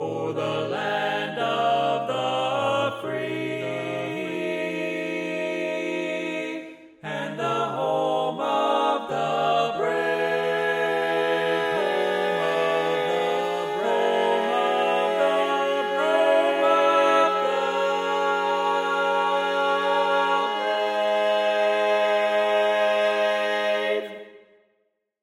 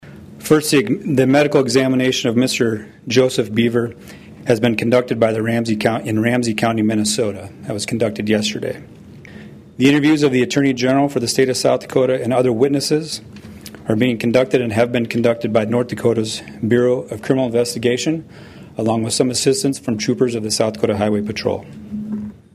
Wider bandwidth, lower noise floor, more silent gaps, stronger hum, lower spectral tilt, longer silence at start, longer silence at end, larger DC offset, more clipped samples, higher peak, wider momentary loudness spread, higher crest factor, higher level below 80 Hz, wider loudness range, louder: about the same, 15.5 kHz vs 15.5 kHz; first, -72 dBFS vs -38 dBFS; neither; neither; about the same, -4.5 dB/octave vs -5 dB/octave; about the same, 0 s vs 0.05 s; first, 0.85 s vs 0.25 s; neither; neither; second, -8 dBFS vs 0 dBFS; second, 7 LU vs 13 LU; about the same, 16 dB vs 16 dB; second, -76 dBFS vs -54 dBFS; first, 6 LU vs 3 LU; second, -23 LUFS vs -17 LUFS